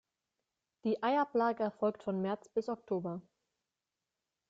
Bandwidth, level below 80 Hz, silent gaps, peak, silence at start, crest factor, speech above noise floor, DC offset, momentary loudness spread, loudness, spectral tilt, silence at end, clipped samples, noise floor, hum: 7.8 kHz; -78 dBFS; none; -20 dBFS; 0.85 s; 16 dB; over 56 dB; under 0.1%; 8 LU; -35 LUFS; -7.5 dB/octave; 1.3 s; under 0.1%; under -90 dBFS; none